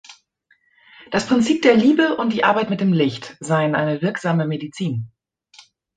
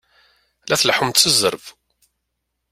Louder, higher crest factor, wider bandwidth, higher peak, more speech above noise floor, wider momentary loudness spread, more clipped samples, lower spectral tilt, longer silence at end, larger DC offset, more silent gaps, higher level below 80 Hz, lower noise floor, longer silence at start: second, -19 LUFS vs -15 LUFS; about the same, 18 dB vs 22 dB; second, 9.4 kHz vs 16 kHz; about the same, -2 dBFS vs 0 dBFS; second, 44 dB vs 58 dB; about the same, 11 LU vs 9 LU; neither; first, -6 dB/octave vs -1.5 dB/octave; about the same, 0.9 s vs 1 s; neither; neither; about the same, -60 dBFS vs -58 dBFS; second, -62 dBFS vs -76 dBFS; second, 0.1 s vs 0.65 s